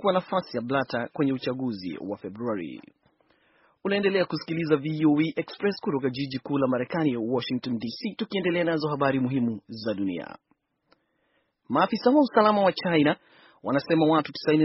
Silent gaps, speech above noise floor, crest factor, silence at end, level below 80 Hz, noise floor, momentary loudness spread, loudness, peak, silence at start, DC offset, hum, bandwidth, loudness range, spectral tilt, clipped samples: none; 46 dB; 20 dB; 0 s; -68 dBFS; -71 dBFS; 12 LU; -26 LUFS; -6 dBFS; 0 s; under 0.1%; none; 6 kHz; 6 LU; -5 dB/octave; under 0.1%